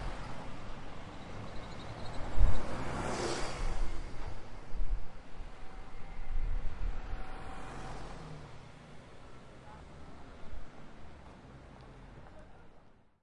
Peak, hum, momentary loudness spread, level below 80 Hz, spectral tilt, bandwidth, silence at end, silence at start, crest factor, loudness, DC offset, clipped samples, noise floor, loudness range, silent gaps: -10 dBFS; none; 17 LU; -40 dBFS; -5 dB/octave; 10.5 kHz; 0.45 s; 0 s; 22 dB; -43 LUFS; under 0.1%; under 0.1%; -58 dBFS; 14 LU; none